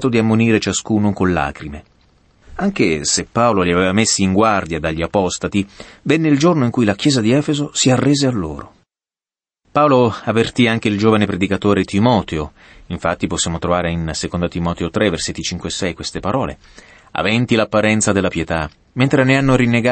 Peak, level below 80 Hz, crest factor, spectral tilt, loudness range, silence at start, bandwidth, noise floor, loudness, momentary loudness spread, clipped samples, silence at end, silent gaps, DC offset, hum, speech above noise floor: -2 dBFS; -40 dBFS; 14 dB; -5 dB/octave; 4 LU; 0 s; 8.8 kHz; under -90 dBFS; -16 LUFS; 10 LU; under 0.1%; 0 s; none; under 0.1%; none; over 74 dB